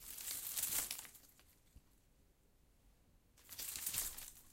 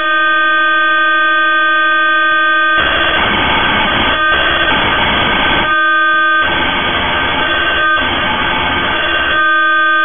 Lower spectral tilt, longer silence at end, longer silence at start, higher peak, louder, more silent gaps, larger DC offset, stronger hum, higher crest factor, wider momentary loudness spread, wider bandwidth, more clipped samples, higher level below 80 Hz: second, 0.5 dB/octave vs -9 dB/octave; about the same, 0 s vs 0 s; about the same, 0 s vs 0 s; second, -22 dBFS vs 0 dBFS; second, -42 LUFS vs -10 LUFS; neither; neither; neither; first, 28 dB vs 12 dB; first, 16 LU vs 3 LU; first, 17 kHz vs 3.7 kHz; neither; second, -68 dBFS vs -32 dBFS